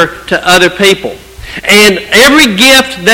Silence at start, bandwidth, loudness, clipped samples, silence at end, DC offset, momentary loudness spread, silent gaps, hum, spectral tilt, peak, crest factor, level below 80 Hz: 0 s; over 20 kHz; -5 LUFS; 6%; 0 s; under 0.1%; 12 LU; none; none; -2.5 dB/octave; 0 dBFS; 6 dB; -34 dBFS